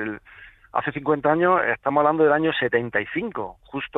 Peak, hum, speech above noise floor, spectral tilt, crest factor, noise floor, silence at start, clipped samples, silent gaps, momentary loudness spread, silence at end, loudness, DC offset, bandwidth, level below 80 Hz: -6 dBFS; none; 26 dB; -8.5 dB/octave; 16 dB; -48 dBFS; 0 s; under 0.1%; none; 14 LU; 0 s; -22 LUFS; under 0.1%; 4 kHz; -58 dBFS